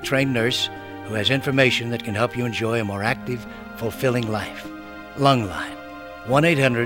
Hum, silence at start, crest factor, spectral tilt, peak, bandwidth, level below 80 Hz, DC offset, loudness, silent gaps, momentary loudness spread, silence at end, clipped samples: none; 0 s; 20 dB; -5.5 dB/octave; -4 dBFS; 18.5 kHz; -52 dBFS; 0.2%; -22 LUFS; none; 18 LU; 0 s; under 0.1%